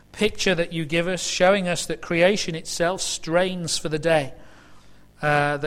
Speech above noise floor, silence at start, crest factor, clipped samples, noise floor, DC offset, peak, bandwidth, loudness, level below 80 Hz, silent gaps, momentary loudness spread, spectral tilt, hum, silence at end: 24 dB; 0.15 s; 18 dB; under 0.1%; -46 dBFS; under 0.1%; -6 dBFS; 15.5 kHz; -22 LUFS; -48 dBFS; none; 7 LU; -3.5 dB/octave; 50 Hz at -50 dBFS; 0 s